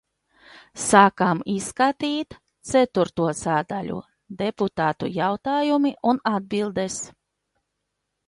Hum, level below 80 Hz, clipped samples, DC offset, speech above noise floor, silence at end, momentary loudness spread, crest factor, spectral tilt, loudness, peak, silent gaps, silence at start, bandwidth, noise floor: none; -58 dBFS; under 0.1%; under 0.1%; 57 dB; 1.2 s; 14 LU; 22 dB; -4.5 dB/octave; -23 LUFS; 0 dBFS; none; 0.55 s; 11.5 kHz; -79 dBFS